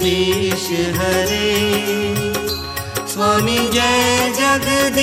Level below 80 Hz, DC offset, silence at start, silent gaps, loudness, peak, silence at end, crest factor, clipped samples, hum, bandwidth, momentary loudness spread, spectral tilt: -38 dBFS; under 0.1%; 0 s; none; -16 LUFS; -4 dBFS; 0 s; 14 dB; under 0.1%; none; 17 kHz; 7 LU; -3.5 dB/octave